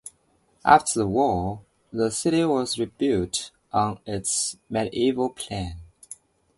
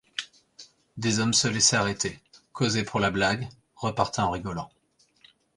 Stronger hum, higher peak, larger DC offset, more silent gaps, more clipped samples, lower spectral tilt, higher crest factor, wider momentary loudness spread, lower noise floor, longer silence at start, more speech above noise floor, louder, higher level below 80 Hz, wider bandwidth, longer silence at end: neither; first, 0 dBFS vs -6 dBFS; neither; neither; neither; about the same, -4 dB/octave vs -3 dB/octave; about the same, 24 dB vs 22 dB; first, 22 LU vs 19 LU; first, -65 dBFS vs -61 dBFS; second, 0.05 s vs 0.2 s; first, 41 dB vs 35 dB; about the same, -24 LUFS vs -25 LUFS; first, -48 dBFS vs -54 dBFS; about the same, 12 kHz vs 11.5 kHz; second, 0.45 s vs 0.9 s